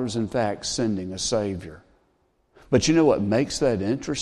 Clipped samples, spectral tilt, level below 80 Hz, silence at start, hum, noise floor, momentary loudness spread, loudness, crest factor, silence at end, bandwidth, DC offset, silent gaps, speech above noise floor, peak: under 0.1%; -5 dB/octave; -50 dBFS; 0 s; none; -66 dBFS; 8 LU; -23 LUFS; 18 dB; 0 s; 12 kHz; under 0.1%; none; 43 dB; -6 dBFS